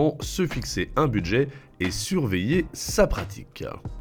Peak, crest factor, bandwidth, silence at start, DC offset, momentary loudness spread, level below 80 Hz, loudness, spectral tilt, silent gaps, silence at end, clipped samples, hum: -6 dBFS; 18 dB; 19 kHz; 0 s; under 0.1%; 13 LU; -38 dBFS; -25 LUFS; -5 dB/octave; none; 0 s; under 0.1%; none